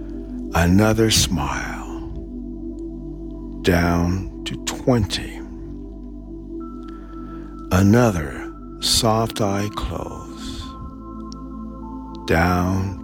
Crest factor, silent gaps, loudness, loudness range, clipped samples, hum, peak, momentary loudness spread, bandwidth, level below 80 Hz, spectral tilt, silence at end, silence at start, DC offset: 18 dB; none; -20 LUFS; 6 LU; under 0.1%; none; -4 dBFS; 19 LU; 17.5 kHz; -34 dBFS; -5 dB/octave; 0 s; 0 s; under 0.1%